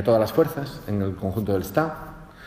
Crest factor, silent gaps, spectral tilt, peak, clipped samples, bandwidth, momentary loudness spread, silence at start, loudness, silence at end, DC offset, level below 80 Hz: 18 dB; none; -7 dB/octave; -6 dBFS; under 0.1%; 15.5 kHz; 12 LU; 0 s; -25 LUFS; 0 s; under 0.1%; -48 dBFS